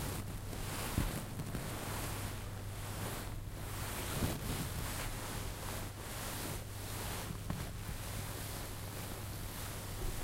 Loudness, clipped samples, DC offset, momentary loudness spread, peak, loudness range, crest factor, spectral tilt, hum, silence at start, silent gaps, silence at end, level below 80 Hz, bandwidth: -42 LUFS; under 0.1%; under 0.1%; 6 LU; -20 dBFS; 2 LU; 20 dB; -4 dB/octave; none; 0 s; none; 0 s; -48 dBFS; 16 kHz